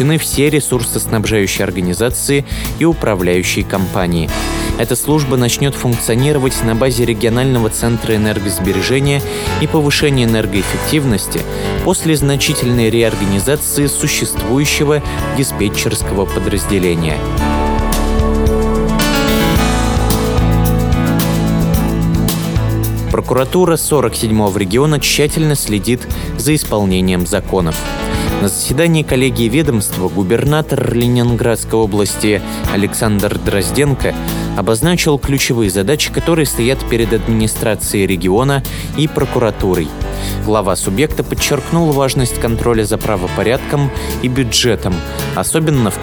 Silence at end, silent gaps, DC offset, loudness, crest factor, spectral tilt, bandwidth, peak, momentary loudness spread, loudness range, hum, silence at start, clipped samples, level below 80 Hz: 0 s; none; under 0.1%; -14 LUFS; 14 dB; -5 dB/octave; over 20 kHz; 0 dBFS; 5 LU; 2 LU; none; 0 s; under 0.1%; -24 dBFS